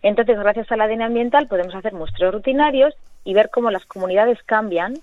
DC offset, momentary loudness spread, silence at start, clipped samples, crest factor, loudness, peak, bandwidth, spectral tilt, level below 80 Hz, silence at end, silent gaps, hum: under 0.1%; 7 LU; 0.05 s; under 0.1%; 16 dB; -19 LUFS; -2 dBFS; 7 kHz; -6.5 dB/octave; -44 dBFS; 0 s; none; none